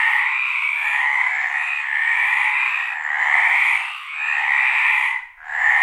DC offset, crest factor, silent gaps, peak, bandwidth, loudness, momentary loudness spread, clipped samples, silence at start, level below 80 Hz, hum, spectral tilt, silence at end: under 0.1%; 18 dB; none; -2 dBFS; 14.5 kHz; -17 LUFS; 7 LU; under 0.1%; 0 s; -68 dBFS; none; 4 dB/octave; 0 s